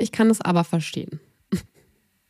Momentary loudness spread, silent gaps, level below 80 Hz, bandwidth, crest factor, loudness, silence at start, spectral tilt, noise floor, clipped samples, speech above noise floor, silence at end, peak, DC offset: 16 LU; none; -58 dBFS; 15 kHz; 16 dB; -23 LUFS; 0 s; -6 dB/octave; -63 dBFS; under 0.1%; 42 dB; 0.65 s; -8 dBFS; under 0.1%